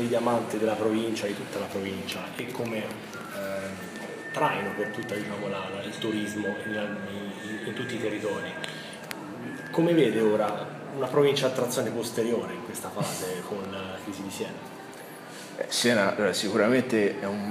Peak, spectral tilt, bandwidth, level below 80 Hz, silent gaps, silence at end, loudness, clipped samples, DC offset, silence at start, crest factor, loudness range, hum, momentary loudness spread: -8 dBFS; -4.5 dB/octave; 16 kHz; -72 dBFS; none; 0 s; -29 LUFS; under 0.1%; under 0.1%; 0 s; 20 dB; 7 LU; none; 14 LU